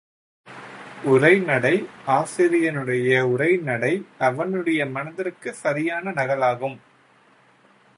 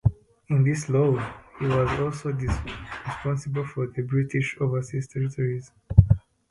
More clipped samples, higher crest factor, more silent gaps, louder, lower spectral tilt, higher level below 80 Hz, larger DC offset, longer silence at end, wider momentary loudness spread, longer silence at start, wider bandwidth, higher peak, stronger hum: neither; about the same, 20 dB vs 24 dB; neither; first, -21 LUFS vs -26 LUFS; second, -6 dB/octave vs -7.5 dB/octave; second, -70 dBFS vs -36 dBFS; neither; first, 1.2 s vs 0.35 s; about the same, 12 LU vs 10 LU; first, 0.45 s vs 0.05 s; about the same, 11.5 kHz vs 11.5 kHz; about the same, -2 dBFS vs 0 dBFS; neither